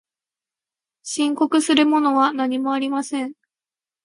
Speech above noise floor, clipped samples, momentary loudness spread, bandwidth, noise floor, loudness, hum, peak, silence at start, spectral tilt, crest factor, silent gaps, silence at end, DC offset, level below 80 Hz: over 71 dB; under 0.1%; 12 LU; 11.5 kHz; under -90 dBFS; -20 LUFS; none; -2 dBFS; 1.05 s; -2 dB/octave; 20 dB; none; 0.7 s; under 0.1%; -76 dBFS